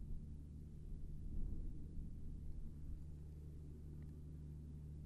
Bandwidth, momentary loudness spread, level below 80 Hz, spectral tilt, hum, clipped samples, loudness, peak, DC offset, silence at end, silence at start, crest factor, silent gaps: 2.4 kHz; 4 LU; -50 dBFS; -9.5 dB/octave; none; under 0.1%; -54 LUFS; -34 dBFS; under 0.1%; 0 s; 0 s; 14 dB; none